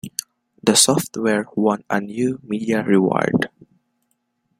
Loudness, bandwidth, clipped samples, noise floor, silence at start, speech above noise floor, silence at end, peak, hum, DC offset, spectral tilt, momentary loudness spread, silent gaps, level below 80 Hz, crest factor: -19 LUFS; 16 kHz; under 0.1%; -70 dBFS; 0.05 s; 52 dB; 1.15 s; 0 dBFS; none; under 0.1%; -3.5 dB/octave; 11 LU; none; -60 dBFS; 20 dB